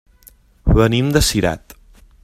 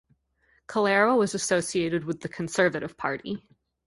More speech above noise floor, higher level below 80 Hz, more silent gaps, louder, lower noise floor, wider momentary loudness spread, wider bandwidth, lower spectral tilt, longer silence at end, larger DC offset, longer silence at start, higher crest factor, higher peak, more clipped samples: second, 34 dB vs 42 dB; first, -26 dBFS vs -64 dBFS; neither; first, -16 LUFS vs -26 LUFS; second, -49 dBFS vs -67 dBFS; about the same, 10 LU vs 12 LU; first, 16 kHz vs 11.5 kHz; about the same, -5 dB/octave vs -4 dB/octave; first, 0.65 s vs 0.5 s; neither; about the same, 0.65 s vs 0.7 s; about the same, 18 dB vs 20 dB; first, 0 dBFS vs -8 dBFS; neither